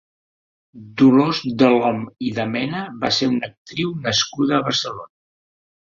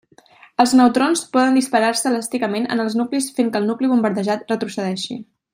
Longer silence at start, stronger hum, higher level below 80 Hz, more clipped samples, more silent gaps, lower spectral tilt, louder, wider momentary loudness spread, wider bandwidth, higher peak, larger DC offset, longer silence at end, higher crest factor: first, 0.75 s vs 0.6 s; neither; first, -58 dBFS vs -66 dBFS; neither; first, 3.57-3.65 s vs none; about the same, -4.5 dB/octave vs -4 dB/octave; about the same, -19 LUFS vs -19 LUFS; about the same, 11 LU vs 10 LU; second, 7.6 kHz vs 16 kHz; about the same, -2 dBFS vs -2 dBFS; neither; first, 0.9 s vs 0.3 s; about the same, 18 dB vs 16 dB